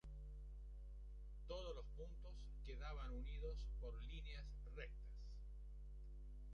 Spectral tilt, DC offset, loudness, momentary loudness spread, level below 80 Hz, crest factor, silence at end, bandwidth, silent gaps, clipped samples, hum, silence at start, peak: -6.5 dB/octave; under 0.1%; -55 LUFS; 8 LU; -52 dBFS; 14 dB; 0 s; 6.8 kHz; none; under 0.1%; 50 Hz at -50 dBFS; 0.05 s; -38 dBFS